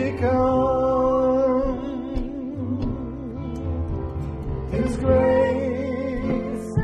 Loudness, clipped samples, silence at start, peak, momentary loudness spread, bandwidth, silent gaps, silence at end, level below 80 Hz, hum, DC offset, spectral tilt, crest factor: -23 LUFS; under 0.1%; 0 s; -8 dBFS; 11 LU; 10.5 kHz; none; 0 s; -34 dBFS; none; under 0.1%; -8.5 dB/octave; 16 dB